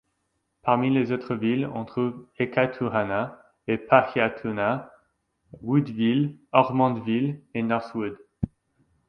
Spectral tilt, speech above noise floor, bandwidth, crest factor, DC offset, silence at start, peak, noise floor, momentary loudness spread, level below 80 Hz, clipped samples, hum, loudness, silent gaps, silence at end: -9.5 dB/octave; 51 dB; 5.8 kHz; 24 dB; under 0.1%; 0.65 s; 0 dBFS; -75 dBFS; 13 LU; -56 dBFS; under 0.1%; none; -25 LUFS; none; 0.6 s